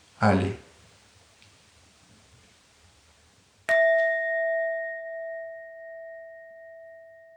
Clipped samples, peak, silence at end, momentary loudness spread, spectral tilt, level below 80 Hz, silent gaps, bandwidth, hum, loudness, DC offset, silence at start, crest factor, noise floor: under 0.1%; -6 dBFS; 0.25 s; 25 LU; -6.5 dB/octave; -66 dBFS; none; 10.5 kHz; none; -26 LUFS; under 0.1%; 0.2 s; 24 dB; -60 dBFS